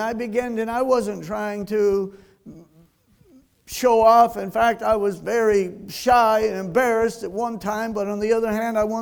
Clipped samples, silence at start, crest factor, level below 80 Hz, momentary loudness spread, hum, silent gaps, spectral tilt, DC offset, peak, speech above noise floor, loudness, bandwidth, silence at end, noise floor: under 0.1%; 0 s; 18 dB; -50 dBFS; 11 LU; none; none; -5 dB/octave; under 0.1%; -4 dBFS; 36 dB; -21 LUFS; over 20 kHz; 0 s; -57 dBFS